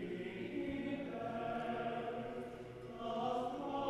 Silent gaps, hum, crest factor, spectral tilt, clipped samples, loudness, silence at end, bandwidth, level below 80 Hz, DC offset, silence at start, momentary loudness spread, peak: none; none; 16 dB; -6.5 dB/octave; under 0.1%; -42 LUFS; 0 s; 13 kHz; -66 dBFS; under 0.1%; 0 s; 8 LU; -26 dBFS